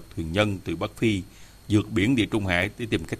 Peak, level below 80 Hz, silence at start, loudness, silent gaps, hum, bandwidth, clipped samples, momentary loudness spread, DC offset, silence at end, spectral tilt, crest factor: -6 dBFS; -48 dBFS; 0 s; -25 LUFS; none; none; 14.5 kHz; under 0.1%; 8 LU; under 0.1%; 0 s; -6 dB/octave; 18 dB